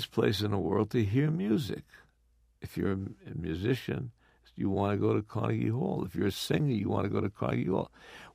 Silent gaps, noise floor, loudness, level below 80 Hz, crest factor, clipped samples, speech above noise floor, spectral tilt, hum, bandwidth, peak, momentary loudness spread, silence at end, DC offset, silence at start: none; -68 dBFS; -31 LUFS; -58 dBFS; 18 dB; under 0.1%; 37 dB; -7 dB/octave; none; 15.5 kHz; -14 dBFS; 11 LU; 0.05 s; under 0.1%; 0 s